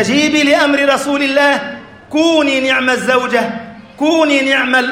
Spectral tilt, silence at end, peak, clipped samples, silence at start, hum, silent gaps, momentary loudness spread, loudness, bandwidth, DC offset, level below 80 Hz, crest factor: -3 dB/octave; 0 s; 0 dBFS; under 0.1%; 0 s; none; none; 9 LU; -12 LUFS; 15.5 kHz; under 0.1%; -54 dBFS; 12 dB